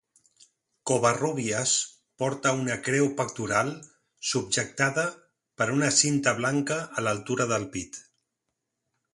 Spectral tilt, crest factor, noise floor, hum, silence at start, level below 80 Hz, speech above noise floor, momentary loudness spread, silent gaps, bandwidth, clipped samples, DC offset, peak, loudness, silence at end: -3.5 dB/octave; 22 dB; -82 dBFS; none; 0.85 s; -64 dBFS; 56 dB; 11 LU; none; 11.5 kHz; under 0.1%; under 0.1%; -6 dBFS; -26 LUFS; 1.15 s